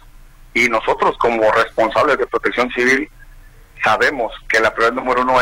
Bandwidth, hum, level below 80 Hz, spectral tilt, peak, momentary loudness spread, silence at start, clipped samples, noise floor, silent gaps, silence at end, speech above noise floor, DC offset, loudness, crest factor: 16.5 kHz; none; -42 dBFS; -3.5 dB/octave; -2 dBFS; 4 LU; 0.15 s; under 0.1%; -41 dBFS; none; 0 s; 25 dB; under 0.1%; -16 LUFS; 16 dB